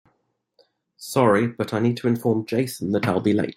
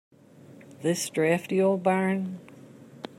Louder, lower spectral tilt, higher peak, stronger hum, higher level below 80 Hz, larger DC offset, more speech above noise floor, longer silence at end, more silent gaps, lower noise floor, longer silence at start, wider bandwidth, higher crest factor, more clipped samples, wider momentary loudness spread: first, -22 LUFS vs -26 LUFS; about the same, -6.5 dB/octave vs -5.5 dB/octave; first, -4 dBFS vs -12 dBFS; neither; first, -62 dBFS vs -74 dBFS; neither; first, 50 dB vs 26 dB; about the same, 0.05 s vs 0.1 s; neither; first, -71 dBFS vs -51 dBFS; first, 1 s vs 0.5 s; first, 16 kHz vs 14.5 kHz; about the same, 18 dB vs 18 dB; neither; second, 6 LU vs 14 LU